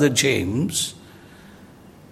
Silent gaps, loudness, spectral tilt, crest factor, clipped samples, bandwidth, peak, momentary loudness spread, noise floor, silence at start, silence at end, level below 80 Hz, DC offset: none; -21 LUFS; -3.5 dB/octave; 20 dB; under 0.1%; 16.5 kHz; -4 dBFS; 12 LU; -46 dBFS; 0 s; 0.2 s; -58 dBFS; under 0.1%